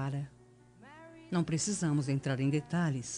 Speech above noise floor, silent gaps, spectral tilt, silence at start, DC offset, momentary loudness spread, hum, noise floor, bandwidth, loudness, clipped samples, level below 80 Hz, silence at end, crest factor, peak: 26 dB; none; -5.5 dB/octave; 0 s; under 0.1%; 19 LU; 60 Hz at -60 dBFS; -58 dBFS; 10.5 kHz; -33 LUFS; under 0.1%; -64 dBFS; 0 s; 14 dB; -20 dBFS